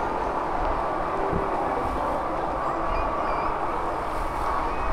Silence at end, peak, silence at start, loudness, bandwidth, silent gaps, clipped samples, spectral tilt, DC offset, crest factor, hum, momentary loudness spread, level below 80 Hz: 0 s; -12 dBFS; 0 s; -27 LUFS; 14 kHz; none; under 0.1%; -6.5 dB/octave; under 0.1%; 14 dB; none; 2 LU; -36 dBFS